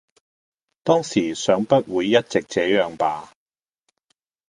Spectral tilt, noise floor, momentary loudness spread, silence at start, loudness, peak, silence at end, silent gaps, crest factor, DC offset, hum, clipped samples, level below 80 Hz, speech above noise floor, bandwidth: -5 dB/octave; under -90 dBFS; 6 LU; 0.85 s; -21 LUFS; -2 dBFS; 1.25 s; none; 22 dB; under 0.1%; none; under 0.1%; -62 dBFS; over 70 dB; 11 kHz